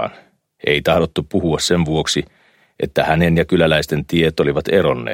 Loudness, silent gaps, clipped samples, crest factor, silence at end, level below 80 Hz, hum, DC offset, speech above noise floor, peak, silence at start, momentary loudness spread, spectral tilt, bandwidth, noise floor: -17 LUFS; none; under 0.1%; 16 dB; 0 s; -38 dBFS; none; under 0.1%; 32 dB; -2 dBFS; 0 s; 7 LU; -5 dB/octave; 16.5 kHz; -48 dBFS